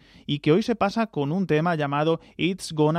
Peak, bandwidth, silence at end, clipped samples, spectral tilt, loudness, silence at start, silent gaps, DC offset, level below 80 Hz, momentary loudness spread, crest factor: -8 dBFS; 14.5 kHz; 0 s; under 0.1%; -6.5 dB/octave; -24 LUFS; 0.3 s; none; under 0.1%; -58 dBFS; 5 LU; 16 dB